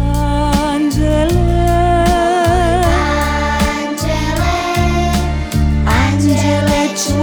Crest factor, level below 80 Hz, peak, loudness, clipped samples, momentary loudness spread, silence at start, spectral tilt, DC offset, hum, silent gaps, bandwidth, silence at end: 12 dB; -20 dBFS; -2 dBFS; -14 LUFS; under 0.1%; 4 LU; 0 s; -5.5 dB/octave; under 0.1%; none; none; over 20 kHz; 0 s